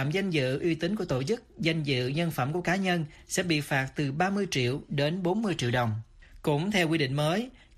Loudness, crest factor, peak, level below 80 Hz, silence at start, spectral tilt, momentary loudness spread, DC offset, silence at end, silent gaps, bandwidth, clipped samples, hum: -29 LUFS; 16 dB; -12 dBFS; -56 dBFS; 0 s; -5.5 dB/octave; 5 LU; under 0.1%; 0.2 s; none; 14 kHz; under 0.1%; none